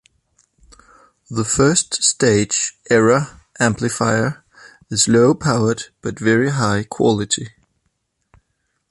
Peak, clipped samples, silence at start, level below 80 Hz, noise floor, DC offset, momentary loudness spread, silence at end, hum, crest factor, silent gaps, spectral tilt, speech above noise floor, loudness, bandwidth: -2 dBFS; under 0.1%; 1.3 s; -48 dBFS; -70 dBFS; under 0.1%; 10 LU; 1.4 s; none; 18 dB; none; -4 dB/octave; 54 dB; -17 LUFS; 11.5 kHz